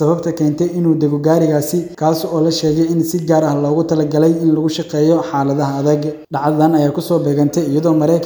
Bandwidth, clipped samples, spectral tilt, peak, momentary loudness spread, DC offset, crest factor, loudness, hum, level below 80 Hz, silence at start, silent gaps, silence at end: over 20 kHz; under 0.1%; -7 dB/octave; 0 dBFS; 4 LU; under 0.1%; 14 dB; -15 LUFS; none; -52 dBFS; 0 s; none; 0 s